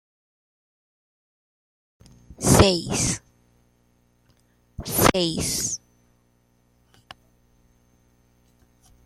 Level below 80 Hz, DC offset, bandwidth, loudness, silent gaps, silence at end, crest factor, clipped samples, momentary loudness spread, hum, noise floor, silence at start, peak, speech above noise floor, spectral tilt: -42 dBFS; under 0.1%; 15 kHz; -21 LUFS; none; 3.3 s; 26 dB; under 0.1%; 16 LU; 60 Hz at -55 dBFS; -64 dBFS; 2.3 s; -2 dBFS; 43 dB; -4 dB/octave